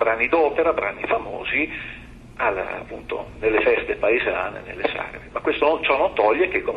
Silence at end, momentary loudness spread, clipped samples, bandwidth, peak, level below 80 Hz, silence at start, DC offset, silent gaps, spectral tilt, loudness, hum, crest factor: 0 s; 12 LU; under 0.1%; 5.6 kHz; -6 dBFS; -46 dBFS; 0 s; under 0.1%; none; -6.5 dB/octave; -22 LUFS; none; 16 dB